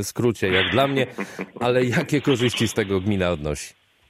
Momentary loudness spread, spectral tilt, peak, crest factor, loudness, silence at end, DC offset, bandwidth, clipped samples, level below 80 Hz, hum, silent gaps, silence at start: 11 LU; -5 dB/octave; -4 dBFS; 18 dB; -22 LUFS; 0.4 s; under 0.1%; 16 kHz; under 0.1%; -48 dBFS; none; none; 0 s